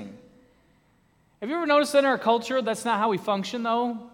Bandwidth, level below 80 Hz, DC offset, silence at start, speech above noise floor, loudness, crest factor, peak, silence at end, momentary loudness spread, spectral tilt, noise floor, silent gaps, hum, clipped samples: 17 kHz; -70 dBFS; under 0.1%; 0 s; 39 dB; -24 LUFS; 18 dB; -8 dBFS; 0.05 s; 9 LU; -4 dB/octave; -63 dBFS; none; none; under 0.1%